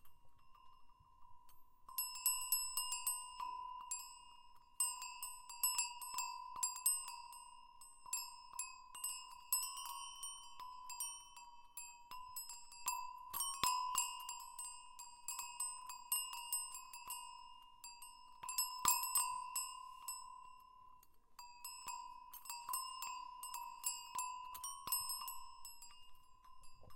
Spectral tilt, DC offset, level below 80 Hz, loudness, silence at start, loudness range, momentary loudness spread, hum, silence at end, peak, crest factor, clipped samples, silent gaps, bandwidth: 2.5 dB/octave; under 0.1%; -72 dBFS; -42 LUFS; 0 s; 7 LU; 18 LU; none; 0 s; -18 dBFS; 28 dB; under 0.1%; none; 17 kHz